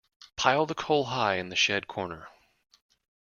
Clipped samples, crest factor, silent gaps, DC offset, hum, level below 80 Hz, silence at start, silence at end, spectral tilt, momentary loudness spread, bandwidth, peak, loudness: under 0.1%; 24 dB; none; under 0.1%; none; -64 dBFS; 0.4 s; 0.9 s; -3 dB/octave; 13 LU; 7.2 kHz; -6 dBFS; -27 LUFS